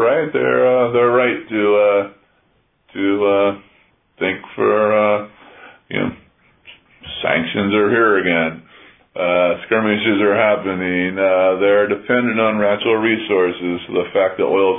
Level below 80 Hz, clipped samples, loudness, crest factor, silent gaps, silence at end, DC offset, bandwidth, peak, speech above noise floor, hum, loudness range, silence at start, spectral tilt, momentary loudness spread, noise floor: -58 dBFS; under 0.1%; -16 LUFS; 16 dB; none; 0 s; under 0.1%; 3.8 kHz; -2 dBFS; 45 dB; none; 4 LU; 0 s; -9.5 dB/octave; 9 LU; -61 dBFS